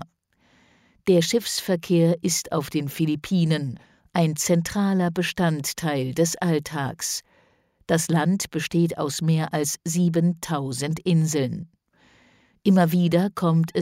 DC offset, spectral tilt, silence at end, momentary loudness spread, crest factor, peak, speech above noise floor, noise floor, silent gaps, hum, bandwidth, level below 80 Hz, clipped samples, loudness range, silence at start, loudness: under 0.1%; -5.5 dB/octave; 0 s; 7 LU; 16 dB; -8 dBFS; 41 dB; -63 dBFS; none; none; 16 kHz; -58 dBFS; under 0.1%; 2 LU; 0 s; -23 LUFS